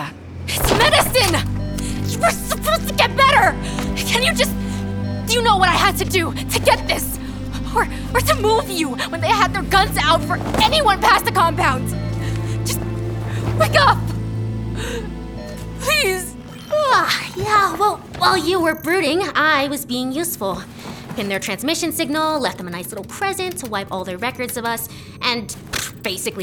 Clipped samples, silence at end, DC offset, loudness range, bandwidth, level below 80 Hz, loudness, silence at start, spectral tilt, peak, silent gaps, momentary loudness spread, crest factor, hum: under 0.1%; 0 s; under 0.1%; 6 LU; over 20 kHz; -34 dBFS; -18 LUFS; 0 s; -4 dB/octave; -2 dBFS; none; 12 LU; 18 dB; none